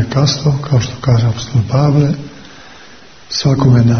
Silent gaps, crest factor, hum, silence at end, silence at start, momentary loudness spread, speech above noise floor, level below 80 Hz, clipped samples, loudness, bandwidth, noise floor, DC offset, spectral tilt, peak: none; 14 dB; none; 0 s; 0 s; 7 LU; 28 dB; -38 dBFS; under 0.1%; -14 LUFS; 6.6 kHz; -39 dBFS; 0.7%; -6.5 dB/octave; 0 dBFS